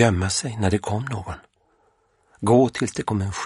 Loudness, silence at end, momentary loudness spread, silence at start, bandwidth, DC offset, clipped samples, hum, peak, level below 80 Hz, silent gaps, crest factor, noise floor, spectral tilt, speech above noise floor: -22 LUFS; 0 s; 13 LU; 0 s; 11.5 kHz; under 0.1%; under 0.1%; none; -2 dBFS; -48 dBFS; none; 20 dB; -64 dBFS; -5.5 dB/octave; 42 dB